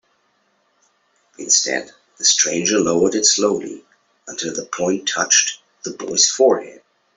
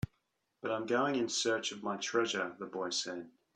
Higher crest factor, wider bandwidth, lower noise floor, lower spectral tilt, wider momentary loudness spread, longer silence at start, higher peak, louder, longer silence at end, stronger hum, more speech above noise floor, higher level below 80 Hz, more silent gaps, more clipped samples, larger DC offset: about the same, 18 dB vs 18 dB; second, 8.4 kHz vs 11 kHz; second, -64 dBFS vs -81 dBFS; second, -1 dB/octave vs -3 dB/octave; first, 17 LU vs 10 LU; first, 1.4 s vs 0.65 s; first, -2 dBFS vs -18 dBFS; first, -16 LUFS vs -35 LUFS; first, 0.4 s vs 0.25 s; neither; about the same, 46 dB vs 46 dB; first, -62 dBFS vs -68 dBFS; neither; neither; neither